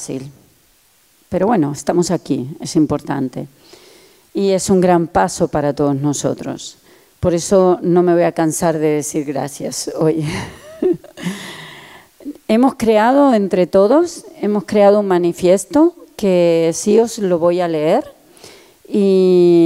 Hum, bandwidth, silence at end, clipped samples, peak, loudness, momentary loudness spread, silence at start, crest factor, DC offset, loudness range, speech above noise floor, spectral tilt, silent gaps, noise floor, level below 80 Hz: none; 16 kHz; 0 s; under 0.1%; 0 dBFS; -15 LUFS; 14 LU; 0 s; 16 dB; under 0.1%; 6 LU; 40 dB; -6 dB/octave; none; -54 dBFS; -48 dBFS